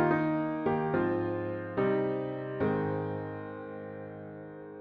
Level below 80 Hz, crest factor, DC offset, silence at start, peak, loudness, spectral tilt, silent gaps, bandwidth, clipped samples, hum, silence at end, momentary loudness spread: -64 dBFS; 16 dB; under 0.1%; 0 s; -16 dBFS; -32 LUFS; -10.5 dB/octave; none; 5.2 kHz; under 0.1%; none; 0 s; 14 LU